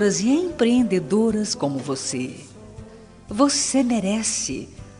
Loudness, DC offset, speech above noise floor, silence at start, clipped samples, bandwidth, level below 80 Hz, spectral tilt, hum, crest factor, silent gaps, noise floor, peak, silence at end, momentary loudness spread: -21 LUFS; under 0.1%; 22 dB; 0 s; under 0.1%; 11 kHz; -52 dBFS; -4 dB/octave; none; 16 dB; none; -43 dBFS; -6 dBFS; 0 s; 14 LU